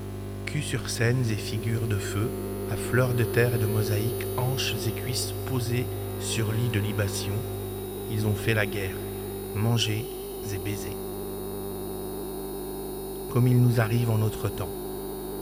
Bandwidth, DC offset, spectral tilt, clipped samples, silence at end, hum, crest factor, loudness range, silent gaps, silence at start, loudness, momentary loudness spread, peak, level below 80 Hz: 19 kHz; under 0.1%; -5.5 dB/octave; under 0.1%; 0 s; 50 Hz at -35 dBFS; 18 dB; 4 LU; none; 0 s; -28 LUFS; 10 LU; -8 dBFS; -46 dBFS